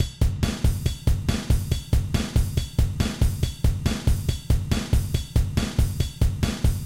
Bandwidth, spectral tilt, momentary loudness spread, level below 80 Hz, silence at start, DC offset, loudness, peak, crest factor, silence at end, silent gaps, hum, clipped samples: 16.5 kHz; -5.5 dB/octave; 1 LU; -26 dBFS; 0 s; 0.2%; -25 LUFS; -8 dBFS; 16 dB; 0 s; none; none; under 0.1%